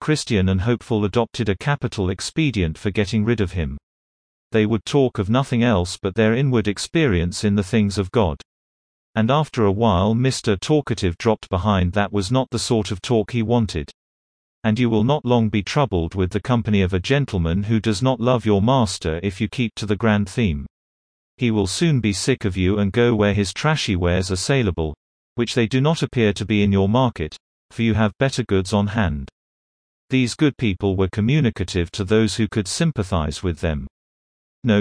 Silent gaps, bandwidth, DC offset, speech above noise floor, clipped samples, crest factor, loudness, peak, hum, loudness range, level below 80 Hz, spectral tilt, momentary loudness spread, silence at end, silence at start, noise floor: 3.83-4.50 s, 8.45-9.14 s, 13.94-14.62 s, 20.70-21.38 s, 24.97-25.36 s, 27.40-27.69 s, 29.32-30.08 s, 33.90-34.62 s; 10.5 kHz; under 0.1%; over 71 dB; under 0.1%; 16 dB; -20 LUFS; -4 dBFS; none; 2 LU; -40 dBFS; -6 dB/octave; 6 LU; 0 s; 0 s; under -90 dBFS